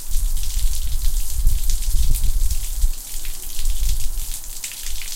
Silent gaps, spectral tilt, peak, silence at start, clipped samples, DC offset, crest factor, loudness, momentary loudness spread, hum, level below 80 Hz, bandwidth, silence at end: none; -2 dB/octave; -4 dBFS; 0 s; under 0.1%; under 0.1%; 12 dB; -26 LUFS; 6 LU; none; -20 dBFS; 17 kHz; 0 s